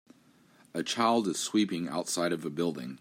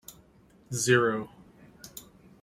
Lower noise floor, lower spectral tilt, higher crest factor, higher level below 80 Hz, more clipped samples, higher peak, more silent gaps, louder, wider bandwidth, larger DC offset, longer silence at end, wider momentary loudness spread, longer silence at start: about the same, -62 dBFS vs -59 dBFS; about the same, -4 dB/octave vs -4 dB/octave; about the same, 20 dB vs 22 dB; second, -78 dBFS vs -64 dBFS; neither; about the same, -12 dBFS vs -10 dBFS; neither; second, -30 LUFS vs -26 LUFS; about the same, 16 kHz vs 16.5 kHz; neither; second, 0.05 s vs 0.4 s; second, 7 LU vs 25 LU; first, 0.75 s vs 0.1 s